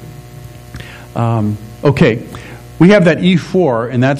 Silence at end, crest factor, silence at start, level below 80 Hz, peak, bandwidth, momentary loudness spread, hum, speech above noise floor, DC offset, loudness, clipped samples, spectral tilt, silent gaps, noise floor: 0 s; 14 dB; 0 s; -40 dBFS; 0 dBFS; 14.5 kHz; 24 LU; 60 Hz at -35 dBFS; 21 dB; under 0.1%; -12 LUFS; 0.4%; -7.5 dB/octave; none; -33 dBFS